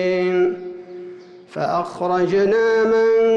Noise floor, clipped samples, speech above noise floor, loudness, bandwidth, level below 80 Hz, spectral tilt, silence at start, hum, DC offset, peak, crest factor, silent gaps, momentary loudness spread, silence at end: -38 dBFS; under 0.1%; 21 dB; -18 LUFS; 7.6 kHz; -58 dBFS; -6.5 dB/octave; 0 s; none; under 0.1%; -10 dBFS; 8 dB; none; 19 LU; 0 s